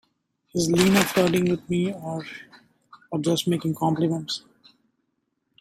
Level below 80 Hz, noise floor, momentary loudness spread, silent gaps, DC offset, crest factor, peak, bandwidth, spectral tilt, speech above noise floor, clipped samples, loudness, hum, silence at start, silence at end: -58 dBFS; -75 dBFS; 14 LU; none; under 0.1%; 24 dB; -2 dBFS; 16 kHz; -5 dB/octave; 52 dB; under 0.1%; -24 LUFS; none; 0.55 s; 1.2 s